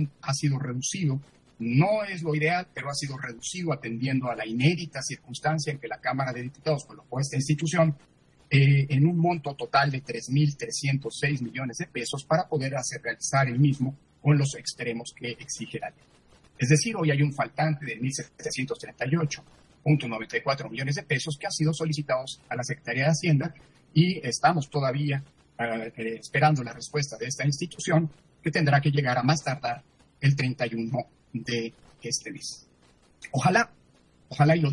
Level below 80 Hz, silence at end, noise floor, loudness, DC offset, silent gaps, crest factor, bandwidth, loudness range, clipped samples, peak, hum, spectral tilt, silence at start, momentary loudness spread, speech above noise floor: -64 dBFS; 0 s; -60 dBFS; -27 LUFS; under 0.1%; none; 20 dB; 11.5 kHz; 4 LU; under 0.1%; -6 dBFS; none; -5.5 dB/octave; 0 s; 11 LU; 34 dB